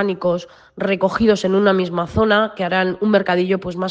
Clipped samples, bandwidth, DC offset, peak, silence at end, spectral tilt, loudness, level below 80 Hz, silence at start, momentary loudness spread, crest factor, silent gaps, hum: under 0.1%; 8 kHz; under 0.1%; -2 dBFS; 0 s; -6.5 dB/octave; -18 LUFS; -46 dBFS; 0 s; 6 LU; 16 dB; none; none